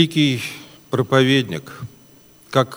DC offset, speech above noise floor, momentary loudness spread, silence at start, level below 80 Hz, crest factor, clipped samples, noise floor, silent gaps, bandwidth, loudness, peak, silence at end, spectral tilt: under 0.1%; 31 dB; 21 LU; 0 s; -60 dBFS; 20 dB; under 0.1%; -49 dBFS; none; over 20 kHz; -19 LUFS; 0 dBFS; 0 s; -5.5 dB/octave